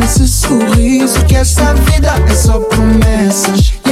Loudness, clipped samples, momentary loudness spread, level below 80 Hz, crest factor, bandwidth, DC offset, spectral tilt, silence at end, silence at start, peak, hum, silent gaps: -10 LUFS; under 0.1%; 1 LU; -12 dBFS; 8 dB; 16 kHz; under 0.1%; -5 dB/octave; 0 s; 0 s; 0 dBFS; none; none